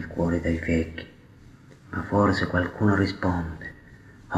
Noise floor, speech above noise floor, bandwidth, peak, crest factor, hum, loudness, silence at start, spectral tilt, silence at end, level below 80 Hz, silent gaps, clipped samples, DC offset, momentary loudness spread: -50 dBFS; 25 dB; 10 kHz; -8 dBFS; 20 dB; none; -25 LUFS; 0 s; -7.5 dB/octave; 0 s; -44 dBFS; none; under 0.1%; under 0.1%; 17 LU